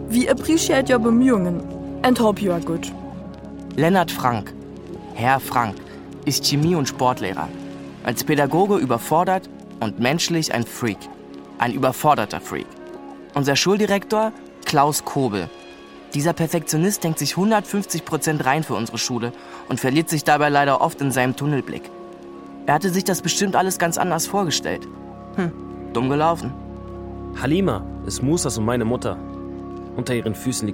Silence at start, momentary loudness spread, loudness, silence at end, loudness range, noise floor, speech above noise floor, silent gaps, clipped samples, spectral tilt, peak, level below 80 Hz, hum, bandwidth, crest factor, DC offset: 0 s; 17 LU; -21 LUFS; 0 s; 3 LU; -41 dBFS; 21 dB; none; under 0.1%; -4.5 dB/octave; -2 dBFS; -46 dBFS; none; 17 kHz; 20 dB; under 0.1%